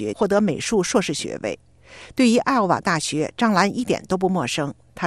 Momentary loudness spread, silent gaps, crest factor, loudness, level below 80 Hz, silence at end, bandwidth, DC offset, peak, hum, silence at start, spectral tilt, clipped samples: 10 LU; none; 18 dB; -21 LUFS; -54 dBFS; 0 s; 13 kHz; 0.1%; -2 dBFS; none; 0 s; -4.5 dB/octave; under 0.1%